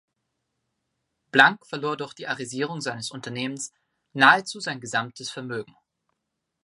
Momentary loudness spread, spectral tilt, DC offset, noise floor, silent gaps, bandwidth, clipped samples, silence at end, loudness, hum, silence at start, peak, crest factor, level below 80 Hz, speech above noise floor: 17 LU; -3 dB/octave; under 0.1%; -80 dBFS; none; 11.5 kHz; under 0.1%; 1 s; -24 LUFS; none; 1.35 s; 0 dBFS; 26 dB; -76 dBFS; 56 dB